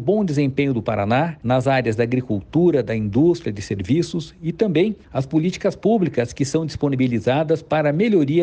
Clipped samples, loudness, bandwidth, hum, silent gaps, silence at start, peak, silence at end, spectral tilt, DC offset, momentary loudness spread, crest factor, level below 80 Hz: under 0.1%; -20 LUFS; 9.4 kHz; none; none; 0 s; -6 dBFS; 0 s; -7 dB/octave; under 0.1%; 5 LU; 14 dB; -48 dBFS